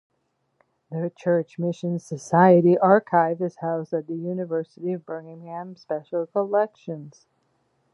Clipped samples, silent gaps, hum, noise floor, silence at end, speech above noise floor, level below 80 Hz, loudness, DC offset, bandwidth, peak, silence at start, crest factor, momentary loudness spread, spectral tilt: under 0.1%; none; none; -73 dBFS; 0.85 s; 50 dB; -76 dBFS; -23 LUFS; under 0.1%; 10.5 kHz; -2 dBFS; 0.9 s; 22 dB; 19 LU; -8 dB/octave